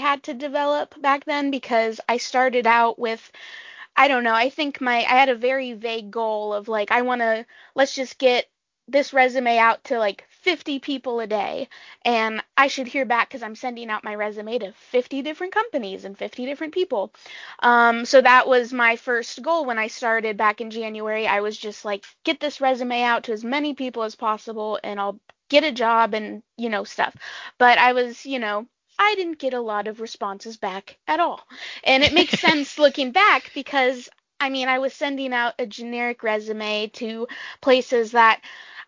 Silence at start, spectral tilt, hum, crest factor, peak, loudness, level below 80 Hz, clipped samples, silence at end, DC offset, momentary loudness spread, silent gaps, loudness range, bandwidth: 0 s; -3 dB/octave; none; 22 dB; 0 dBFS; -21 LUFS; -62 dBFS; under 0.1%; 0 s; under 0.1%; 14 LU; none; 6 LU; 7.6 kHz